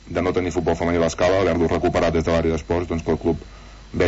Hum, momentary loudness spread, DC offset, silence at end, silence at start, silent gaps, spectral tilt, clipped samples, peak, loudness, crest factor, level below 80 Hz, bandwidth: none; 5 LU; under 0.1%; 0 s; 0.05 s; none; -6 dB/octave; under 0.1%; -8 dBFS; -21 LUFS; 14 dB; -36 dBFS; 8 kHz